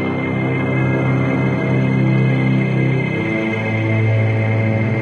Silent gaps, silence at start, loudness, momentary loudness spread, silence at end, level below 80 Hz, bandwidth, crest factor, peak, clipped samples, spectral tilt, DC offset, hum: none; 0 s; -17 LUFS; 3 LU; 0 s; -48 dBFS; 6.6 kHz; 10 dB; -6 dBFS; under 0.1%; -9 dB/octave; under 0.1%; none